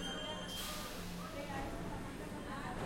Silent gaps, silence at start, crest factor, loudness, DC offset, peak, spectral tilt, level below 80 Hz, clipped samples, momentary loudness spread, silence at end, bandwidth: none; 0 s; 12 dB; -44 LUFS; under 0.1%; -30 dBFS; -4 dB/octave; -52 dBFS; under 0.1%; 4 LU; 0 s; 16.5 kHz